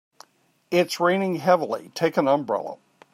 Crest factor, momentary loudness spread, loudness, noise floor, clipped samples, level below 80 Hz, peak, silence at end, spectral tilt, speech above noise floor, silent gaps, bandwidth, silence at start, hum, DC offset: 18 dB; 9 LU; -23 LUFS; -54 dBFS; under 0.1%; -74 dBFS; -6 dBFS; 0.4 s; -5.5 dB/octave; 31 dB; none; 16 kHz; 0.7 s; none; under 0.1%